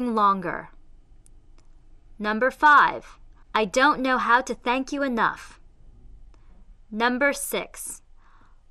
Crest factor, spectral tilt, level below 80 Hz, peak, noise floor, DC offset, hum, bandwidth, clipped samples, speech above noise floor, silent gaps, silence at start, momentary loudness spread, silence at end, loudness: 18 dB; -3 dB/octave; -50 dBFS; -6 dBFS; -51 dBFS; under 0.1%; none; 13 kHz; under 0.1%; 29 dB; none; 0 s; 19 LU; 0.75 s; -22 LUFS